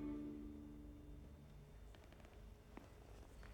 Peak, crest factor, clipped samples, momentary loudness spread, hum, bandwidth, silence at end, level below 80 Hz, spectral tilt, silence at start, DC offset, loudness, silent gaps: -40 dBFS; 16 dB; under 0.1%; 11 LU; none; 19 kHz; 0 s; -60 dBFS; -7 dB/octave; 0 s; under 0.1%; -58 LUFS; none